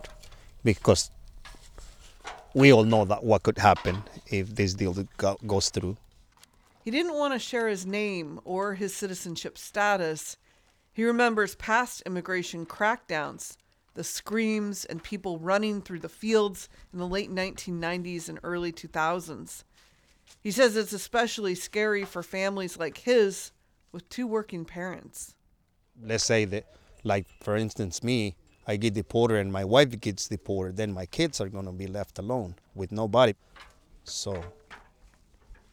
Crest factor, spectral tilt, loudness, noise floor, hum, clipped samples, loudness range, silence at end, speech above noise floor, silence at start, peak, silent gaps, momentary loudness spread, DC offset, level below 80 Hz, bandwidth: 24 dB; -4.5 dB/octave; -28 LUFS; -67 dBFS; none; under 0.1%; 7 LU; 0.2 s; 40 dB; 0 s; -4 dBFS; none; 17 LU; under 0.1%; -54 dBFS; 19 kHz